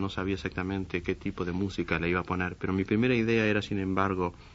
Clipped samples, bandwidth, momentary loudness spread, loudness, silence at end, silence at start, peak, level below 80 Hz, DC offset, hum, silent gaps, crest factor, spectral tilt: under 0.1%; 8 kHz; 7 LU; -29 LUFS; 0 s; 0 s; -10 dBFS; -50 dBFS; under 0.1%; none; none; 20 dB; -7 dB/octave